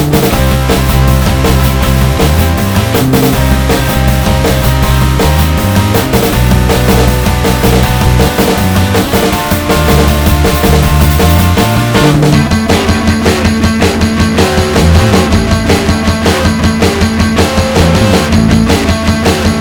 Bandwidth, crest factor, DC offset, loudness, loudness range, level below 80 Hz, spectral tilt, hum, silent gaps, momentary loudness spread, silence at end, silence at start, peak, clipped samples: over 20 kHz; 8 dB; under 0.1%; -9 LUFS; 1 LU; -16 dBFS; -5.5 dB/octave; none; none; 2 LU; 0 s; 0 s; 0 dBFS; 1%